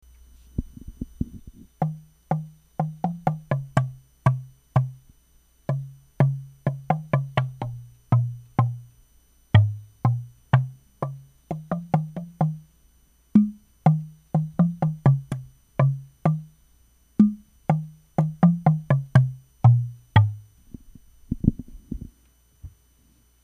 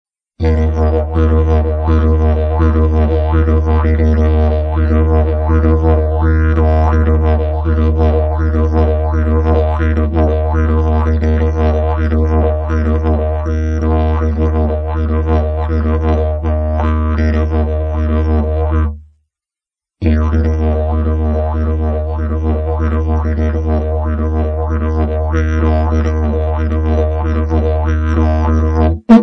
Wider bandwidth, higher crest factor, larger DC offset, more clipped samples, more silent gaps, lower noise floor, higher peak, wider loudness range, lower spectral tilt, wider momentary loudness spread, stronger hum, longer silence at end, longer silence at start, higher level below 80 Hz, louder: first, 9.6 kHz vs 5.8 kHz; first, 22 dB vs 12 dB; neither; neither; neither; second, -60 dBFS vs -89 dBFS; about the same, -2 dBFS vs 0 dBFS; about the same, 6 LU vs 4 LU; about the same, -9 dB/octave vs -10 dB/octave; first, 16 LU vs 4 LU; neither; first, 0.75 s vs 0 s; first, 0.6 s vs 0.4 s; second, -46 dBFS vs -16 dBFS; second, -25 LUFS vs -14 LUFS